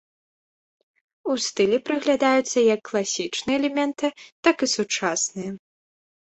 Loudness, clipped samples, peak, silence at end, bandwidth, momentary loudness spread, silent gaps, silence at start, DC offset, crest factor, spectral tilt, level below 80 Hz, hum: -23 LUFS; under 0.1%; -4 dBFS; 0.65 s; 8.4 kHz; 9 LU; 4.32-4.43 s; 1.25 s; under 0.1%; 22 dB; -3 dB/octave; -66 dBFS; none